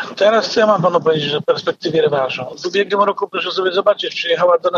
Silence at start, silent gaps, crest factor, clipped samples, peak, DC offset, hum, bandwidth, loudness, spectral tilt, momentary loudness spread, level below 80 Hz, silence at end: 0 s; none; 14 dB; under 0.1%; -2 dBFS; under 0.1%; none; 7.4 kHz; -16 LUFS; -4.5 dB/octave; 6 LU; -64 dBFS; 0 s